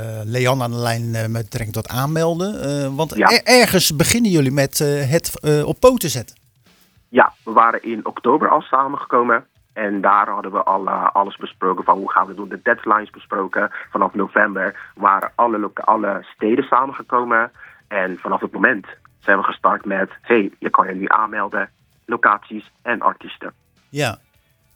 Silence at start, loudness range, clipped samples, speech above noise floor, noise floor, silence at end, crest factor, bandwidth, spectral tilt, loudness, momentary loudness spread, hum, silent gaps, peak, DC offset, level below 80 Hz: 0 s; 4 LU; under 0.1%; 37 dB; -55 dBFS; 0.6 s; 18 dB; over 20 kHz; -4.5 dB/octave; -18 LUFS; 10 LU; none; none; 0 dBFS; under 0.1%; -50 dBFS